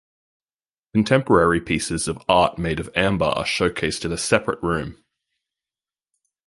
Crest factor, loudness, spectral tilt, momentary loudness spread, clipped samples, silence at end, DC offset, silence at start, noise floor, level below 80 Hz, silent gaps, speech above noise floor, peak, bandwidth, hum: 20 dB; -21 LUFS; -4.5 dB/octave; 8 LU; under 0.1%; 1.55 s; under 0.1%; 0.95 s; under -90 dBFS; -44 dBFS; none; over 70 dB; -2 dBFS; 11.5 kHz; none